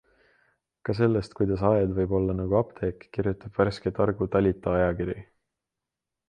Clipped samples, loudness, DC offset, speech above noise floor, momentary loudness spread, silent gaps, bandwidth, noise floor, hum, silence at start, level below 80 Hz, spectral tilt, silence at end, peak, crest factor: under 0.1%; -26 LUFS; under 0.1%; 62 dB; 9 LU; none; 9.4 kHz; -87 dBFS; none; 0.85 s; -46 dBFS; -9 dB/octave; 1.05 s; -8 dBFS; 20 dB